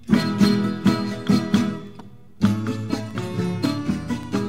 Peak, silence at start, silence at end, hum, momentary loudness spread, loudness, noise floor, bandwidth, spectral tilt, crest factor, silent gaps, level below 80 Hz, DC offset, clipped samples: -4 dBFS; 0.05 s; 0 s; none; 9 LU; -22 LUFS; -44 dBFS; 15.5 kHz; -6.5 dB/octave; 18 dB; none; -50 dBFS; 0.6%; under 0.1%